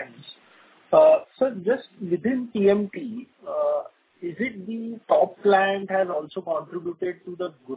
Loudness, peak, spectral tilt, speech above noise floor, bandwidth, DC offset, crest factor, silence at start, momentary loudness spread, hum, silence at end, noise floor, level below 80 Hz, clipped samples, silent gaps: -24 LUFS; -6 dBFS; -10 dB/octave; 32 dB; 4 kHz; under 0.1%; 18 dB; 0 s; 17 LU; none; 0 s; -55 dBFS; -68 dBFS; under 0.1%; none